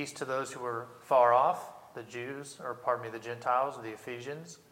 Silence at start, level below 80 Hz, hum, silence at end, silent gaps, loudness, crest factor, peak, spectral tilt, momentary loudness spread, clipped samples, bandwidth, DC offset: 0 s; -80 dBFS; none; 0.15 s; none; -32 LUFS; 20 dB; -12 dBFS; -4.5 dB/octave; 18 LU; under 0.1%; 16.5 kHz; under 0.1%